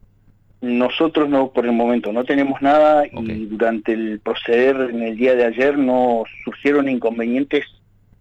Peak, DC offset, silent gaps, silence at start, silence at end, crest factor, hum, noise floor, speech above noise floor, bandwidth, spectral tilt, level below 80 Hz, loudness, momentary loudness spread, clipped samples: -6 dBFS; under 0.1%; none; 0.6 s; 0.55 s; 12 dB; none; -53 dBFS; 35 dB; 8 kHz; -7 dB/octave; -54 dBFS; -18 LUFS; 8 LU; under 0.1%